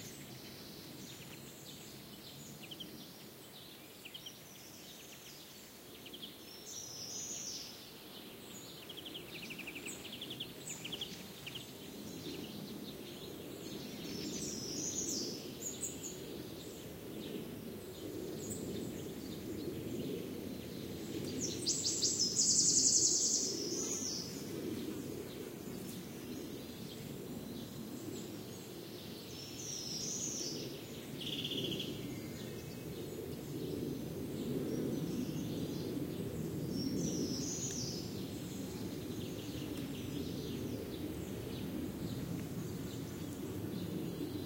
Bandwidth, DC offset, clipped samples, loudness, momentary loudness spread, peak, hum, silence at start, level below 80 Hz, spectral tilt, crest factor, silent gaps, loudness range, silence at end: 16 kHz; under 0.1%; under 0.1%; -40 LUFS; 13 LU; -16 dBFS; none; 0 s; -64 dBFS; -3 dB/octave; 26 dB; none; 16 LU; 0 s